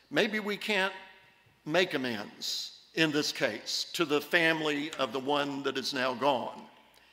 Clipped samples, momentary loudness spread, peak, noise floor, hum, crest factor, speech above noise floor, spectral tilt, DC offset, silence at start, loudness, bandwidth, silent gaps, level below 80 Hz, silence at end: under 0.1%; 9 LU; -10 dBFS; -62 dBFS; none; 22 dB; 31 dB; -3.5 dB/octave; under 0.1%; 0.1 s; -30 LUFS; 16 kHz; none; -78 dBFS; 0.45 s